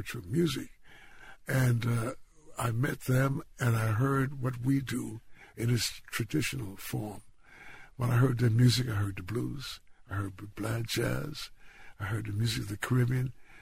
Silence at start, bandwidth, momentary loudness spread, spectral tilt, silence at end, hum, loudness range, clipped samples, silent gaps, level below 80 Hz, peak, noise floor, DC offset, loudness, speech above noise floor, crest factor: 0 s; 16 kHz; 15 LU; -5.5 dB/octave; 0 s; none; 5 LU; under 0.1%; none; -54 dBFS; -14 dBFS; -51 dBFS; under 0.1%; -31 LUFS; 21 dB; 18 dB